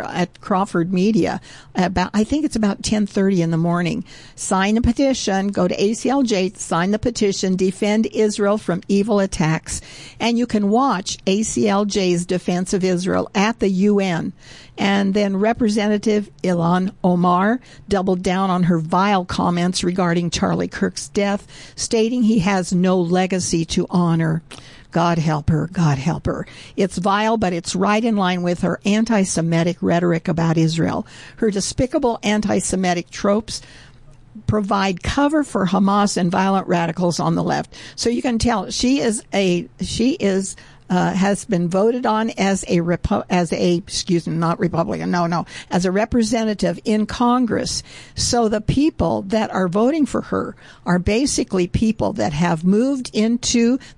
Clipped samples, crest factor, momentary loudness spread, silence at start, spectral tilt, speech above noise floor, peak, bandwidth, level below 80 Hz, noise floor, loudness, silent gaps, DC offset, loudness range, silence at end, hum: under 0.1%; 12 dB; 6 LU; 0 s; -5.5 dB/octave; 25 dB; -6 dBFS; 11.5 kHz; -42 dBFS; -44 dBFS; -19 LUFS; none; 0.1%; 2 LU; 0.05 s; none